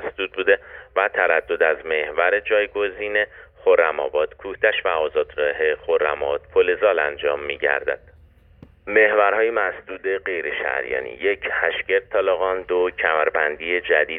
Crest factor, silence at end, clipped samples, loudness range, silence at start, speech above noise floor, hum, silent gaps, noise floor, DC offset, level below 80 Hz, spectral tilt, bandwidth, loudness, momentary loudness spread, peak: 18 dB; 0 s; under 0.1%; 2 LU; 0 s; 30 dB; none; none; -51 dBFS; under 0.1%; -54 dBFS; -7 dB/octave; 3.9 kHz; -21 LUFS; 7 LU; -4 dBFS